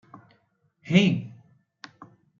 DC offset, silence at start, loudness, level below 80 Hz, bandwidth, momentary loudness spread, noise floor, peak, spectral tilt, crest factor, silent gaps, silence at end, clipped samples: under 0.1%; 0.85 s; -23 LUFS; -68 dBFS; 7.4 kHz; 27 LU; -68 dBFS; -4 dBFS; -6.5 dB/octave; 24 dB; none; 1.1 s; under 0.1%